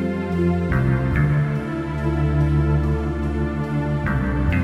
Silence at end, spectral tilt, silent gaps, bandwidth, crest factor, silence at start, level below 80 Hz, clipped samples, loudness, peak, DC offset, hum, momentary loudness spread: 0 s; -9 dB/octave; none; 7.4 kHz; 14 dB; 0 s; -28 dBFS; under 0.1%; -21 LUFS; -6 dBFS; under 0.1%; none; 5 LU